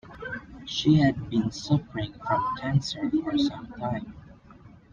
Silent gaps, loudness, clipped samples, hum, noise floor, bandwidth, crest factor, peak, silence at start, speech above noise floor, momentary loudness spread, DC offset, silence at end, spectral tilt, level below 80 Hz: none; -27 LUFS; under 0.1%; none; -51 dBFS; 7.4 kHz; 18 dB; -8 dBFS; 0.05 s; 25 dB; 15 LU; under 0.1%; 0.25 s; -6.5 dB/octave; -52 dBFS